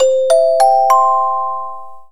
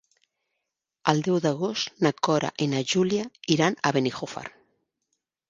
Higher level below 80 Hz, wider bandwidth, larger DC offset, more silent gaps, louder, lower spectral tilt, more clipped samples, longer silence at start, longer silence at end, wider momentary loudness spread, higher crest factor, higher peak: about the same, -72 dBFS vs -68 dBFS; first, 15.5 kHz vs 9.8 kHz; first, 3% vs under 0.1%; neither; first, -12 LUFS vs -25 LUFS; second, -0.5 dB/octave vs -5 dB/octave; neither; second, 0 s vs 1.05 s; second, 0 s vs 1 s; first, 13 LU vs 8 LU; second, 14 dB vs 26 dB; about the same, 0 dBFS vs 0 dBFS